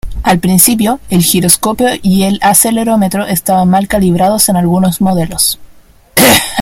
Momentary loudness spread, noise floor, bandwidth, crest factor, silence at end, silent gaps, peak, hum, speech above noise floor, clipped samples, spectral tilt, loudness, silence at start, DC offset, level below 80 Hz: 6 LU; -40 dBFS; over 20 kHz; 10 dB; 0 s; none; 0 dBFS; none; 30 dB; 0.5%; -4 dB/octave; -9 LUFS; 0.05 s; under 0.1%; -32 dBFS